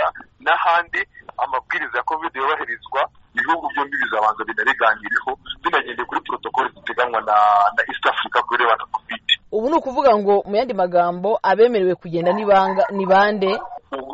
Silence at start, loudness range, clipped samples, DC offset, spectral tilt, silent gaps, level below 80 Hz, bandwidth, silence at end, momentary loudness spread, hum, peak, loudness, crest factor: 0 s; 4 LU; under 0.1%; under 0.1%; -1.5 dB/octave; none; -56 dBFS; 8 kHz; 0 s; 9 LU; none; -2 dBFS; -19 LUFS; 18 dB